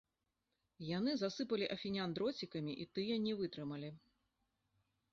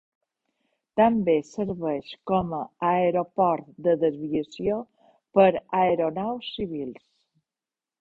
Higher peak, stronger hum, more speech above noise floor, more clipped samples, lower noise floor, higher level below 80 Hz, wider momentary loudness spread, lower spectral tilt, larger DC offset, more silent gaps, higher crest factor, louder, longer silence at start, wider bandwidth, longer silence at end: second, -26 dBFS vs -4 dBFS; neither; second, 47 dB vs over 66 dB; neither; about the same, -88 dBFS vs under -90 dBFS; second, -76 dBFS vs -60 dBFS; second, 8 LU vs 11 LU; second, -4.5 dB/octave vs -7.5 dB/octave; neither; neither; about the same, 18 dB vs 20 dB; second, -41 LUFS vs -25 LUFS; second, 0.8 s vs 0.95 s; about the same, 7.4 kHz vs 7.8 kHz; about the same, 1.15 s vs 1.1 s